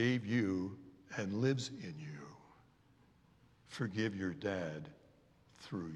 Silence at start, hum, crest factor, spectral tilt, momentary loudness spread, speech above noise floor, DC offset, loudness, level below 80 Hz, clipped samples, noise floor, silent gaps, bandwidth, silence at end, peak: 0 s; none; 20 dB; -6 dB/octave; 17 LU; 30 dB; under 0.1%; -39 LUFS; -76 dBFS; under 0.1%; -68 dBFS; none; 11 kHz; 0 s; -20 dBFS